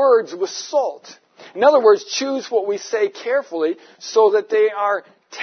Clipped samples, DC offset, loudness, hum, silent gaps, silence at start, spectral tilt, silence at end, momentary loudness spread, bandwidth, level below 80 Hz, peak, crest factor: under 0.1%; under 0.1%; -18 LUFS; none; none; 0 s; -2 dB/octave; 0 s; 11 LU; 6.6 kHz; -84 dBFS; -2 dBFS; 16 dB